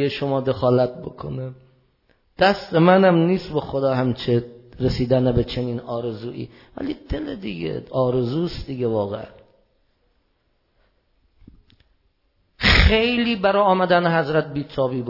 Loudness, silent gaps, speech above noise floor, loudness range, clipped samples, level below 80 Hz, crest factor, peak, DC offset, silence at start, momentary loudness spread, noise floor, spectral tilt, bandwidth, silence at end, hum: -20 LUFS; none; 46 dB; 9 LU; under 0.1%; -34 dBFS; 22 dB; 0 dBFS; under 0.1%; 0 s; 16 LU; -67 dBFS; -7 dB/octave; 5.8 kHz; 0 s; none